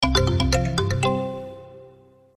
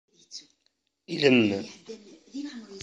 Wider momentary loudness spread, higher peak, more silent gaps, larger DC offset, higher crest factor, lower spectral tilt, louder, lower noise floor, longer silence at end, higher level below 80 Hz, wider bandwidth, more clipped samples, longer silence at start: second, 17 LU vs 24 LU; about the same, -6 dBFS vs -6 dBFS; neither; neither; second, 18 dB vs 24 dB; about the same, -5 dB/octave vs -5 dB/octave; about the same, -22 LUFS vs -24 LUFS; second, -51 dBFS vs -74 dBFS; first, 0.5 s vs 0 s; first, -32 dBFS vs -68 dBFS; first, 13 kHz vs 8 kHz; neither; second, 0 s vs 0.3 s